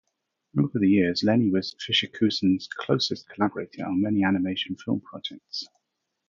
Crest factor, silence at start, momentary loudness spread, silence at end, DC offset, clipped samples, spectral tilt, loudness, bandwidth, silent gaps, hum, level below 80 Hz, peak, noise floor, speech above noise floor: 18 dB; 0.55 s; 13 LU; 0.6 s; under 0.1%; under 0.1%; -6 dB/octave; -25 LUFS; 7.4 kHz; none; none; -56 dBFS; -8 dBFS; -79 dBFS; 54 dB